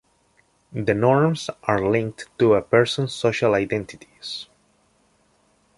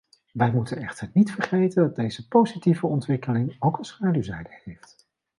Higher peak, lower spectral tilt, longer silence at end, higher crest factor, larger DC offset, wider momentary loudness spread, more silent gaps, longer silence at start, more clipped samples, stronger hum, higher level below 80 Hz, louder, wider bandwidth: about the same, -4 dBFS vs -6 dBFS; second, -6 dB/octave vs -8 dB/octave; first, 1.35 s vs 0.65 s; about the same, 20 dB vs 18 dB; neither; about the same, 15 LU vs 14 LU; neither; first, 0.7 s vs 0.35 s; neither; neither; about the same, -54 dBFS vs -58 dBFS; first, -21 LUFS vs -24 LUFS; about the same, 11.5 kHz vs 11.5 kHz